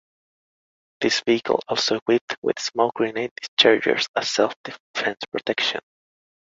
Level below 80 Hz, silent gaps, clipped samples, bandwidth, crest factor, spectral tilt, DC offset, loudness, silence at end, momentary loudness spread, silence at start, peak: -68 dBFS; 2.02-2.06 s, 2.21-2.28 s, 2.38-2.42 s, 3.31-3.36 s, 3.48-3.57 s, 4.08-4.14 s, 4.56-4.64 s, 4.80-4.94 s; under 0.1%; 7.8 kHz; 22 dB; -2.5 dB/octave; under 0.1%; -22 LUFS; 0.75 s; 9 LU; 1 s; -2 dBFS